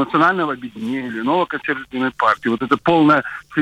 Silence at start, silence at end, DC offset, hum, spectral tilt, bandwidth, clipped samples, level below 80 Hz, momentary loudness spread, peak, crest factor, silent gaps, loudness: 0 s; 0 s; under 0.1%; none; -7 dB/octave; 9.8 kHz; under 0.1%; -56 dBFS; 10 LU; -4 dBFS; 14 dB; none; -18 LUFS